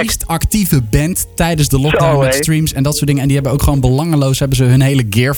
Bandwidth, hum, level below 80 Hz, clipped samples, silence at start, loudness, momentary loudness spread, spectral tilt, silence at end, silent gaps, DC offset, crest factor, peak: 19.5 kHz; none; -24 dBFS; under 0.1%; 0 s; -13 LUFS; 4 LU; -5.5 dB/octave; 0 s; none; under 0.1%; 12 dB; 0 dBFS